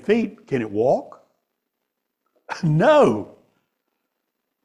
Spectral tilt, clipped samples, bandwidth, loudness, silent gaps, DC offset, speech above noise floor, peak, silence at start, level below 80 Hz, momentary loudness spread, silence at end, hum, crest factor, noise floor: -7.5 dB/octave; under 0.1%; 10.5 kHz; -20 LUFS; none; under 0.1%; 60 dB; -6 dBFS; 0.05 s; -62 dBFS; 14 LU; 1.4 s; none; 18 dB; -78 dBFS